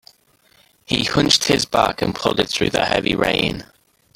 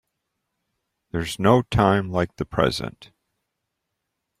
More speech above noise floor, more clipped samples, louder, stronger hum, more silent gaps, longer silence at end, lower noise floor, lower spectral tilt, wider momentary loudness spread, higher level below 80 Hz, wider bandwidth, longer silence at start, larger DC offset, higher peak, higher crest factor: second, 38 dB vs 59 dB; neither; first, -18 LUFS vs -22 LUFS; neither; neither; second, 0.55 s vs 1.5 s; second, -57 dBFS vs -80 dBFS; second, -3.5 dB/octave vs -6.5 dB/octave; second, 6 LU vs 12 LU; about the same, -44 dBFS vs -46 dBFS; about the same, 17 kHz vs 15.5 kHz; second, 0.9 s vs 1.15 s; neither; about the same, -2 dBFS vs -2 dBFS; about the same, 20 dB vs 22 dB